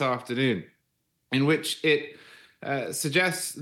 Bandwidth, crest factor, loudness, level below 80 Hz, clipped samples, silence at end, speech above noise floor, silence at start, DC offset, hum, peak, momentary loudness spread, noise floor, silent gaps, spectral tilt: 17 kHz; 18 dB; -26 LUFS; -78 dBFS; under 0.1%; 0 s; 49 dB; 0 s; under 0.1%; none; -10 dBFS; 9 LU; -76 dBFS; none; -4 dB/octave